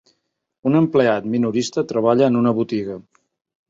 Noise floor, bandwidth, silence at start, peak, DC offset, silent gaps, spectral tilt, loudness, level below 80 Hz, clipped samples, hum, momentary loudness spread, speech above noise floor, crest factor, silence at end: -67 dBFS; 7.8 kHz; 0.65 s; -2 dBFS; under 0.1%; none; -6.5 dB/octave; -19 LUFS; -60 dBFS; under 0.1%; none; 10 LU; 49 dB; 16 dB; 0.7 s